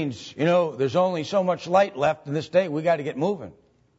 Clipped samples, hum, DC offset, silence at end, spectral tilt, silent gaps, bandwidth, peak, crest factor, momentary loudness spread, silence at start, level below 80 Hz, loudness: under 0.1%; none; under 0.1%; 0.45 s; -6.5 dB/octave; none; 8 kHz; -8 dBFS; 16 dB; 7 LU; 0 s; -64 dBFS; -23 LUFS